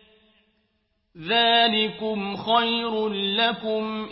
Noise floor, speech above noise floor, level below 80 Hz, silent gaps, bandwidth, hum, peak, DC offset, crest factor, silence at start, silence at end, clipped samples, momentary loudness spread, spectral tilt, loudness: -71 dBFS; 48 dB; -62 dBFS; none; 5.8 kHz; none; -8 dBFS; under 0.1%; 18 dB; 1.15 s; 0 s; under 0.1%; 10 LU; -8.5 dB/octave; -22 LUFS